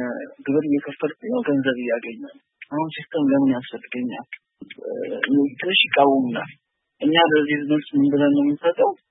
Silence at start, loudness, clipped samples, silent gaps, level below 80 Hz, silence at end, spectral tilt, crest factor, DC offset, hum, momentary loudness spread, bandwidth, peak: 0 s; -21 LUFS; under 0.1%; none; -72 dBFS; 0.15 s; -10 dB/octave; 20 dB; under 0.1%; none; 15 LU; 4 kHz; -2 dBFS